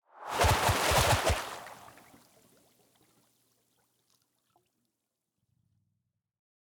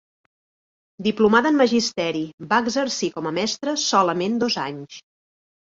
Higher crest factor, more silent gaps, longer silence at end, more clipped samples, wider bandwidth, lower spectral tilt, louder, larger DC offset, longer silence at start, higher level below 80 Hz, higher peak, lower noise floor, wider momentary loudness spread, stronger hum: about the same, 22 dB vs 20 dB; second, none vs 2.33-2.38 s; first, 4.95 s vs 0.7 s; neither; first, over 20 kHz vs 7.8 kHz; about the same, -3.5 dB/octave vs -3.5 dB/octave; second, -27 LUFS vs -21 LUFS; neither; second, 0.2 s vs 1 s; first, -46 dBFS vs -62 dBFS; second, -12 dBFS vs -2 dBFS; second, -85 dBFS vs under -90 dBFS; first, 18 LU vs 10 LU; neither